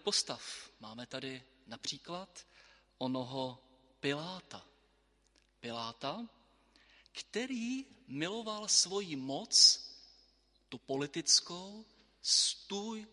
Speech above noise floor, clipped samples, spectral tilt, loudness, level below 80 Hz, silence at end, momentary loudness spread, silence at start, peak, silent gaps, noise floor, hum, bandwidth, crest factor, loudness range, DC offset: 37 dB; under 0.1%; -1.5 dB/octave; -32 LUFS; -76 dBFS; 0.05 s; 22 LU; 0.05 s; -12 dBFS; none; -72 dBFS; none; 11.5 kHz; 26 dB; 14 LU; under 0.1%